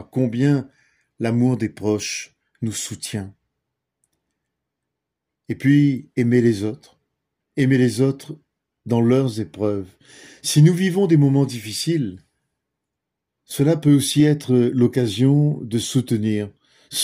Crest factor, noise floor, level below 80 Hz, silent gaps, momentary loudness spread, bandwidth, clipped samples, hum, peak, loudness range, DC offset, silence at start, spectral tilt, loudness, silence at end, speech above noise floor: 16 dB; -82 dBFS; -60 dBFS; none; 14 LU; 16 kHz; under 0.1%; none; -4 dBFS; 7 LU; under 0.1%; 0 s; -6 dB/octave; -20 LUFS; 0 s; 63 dB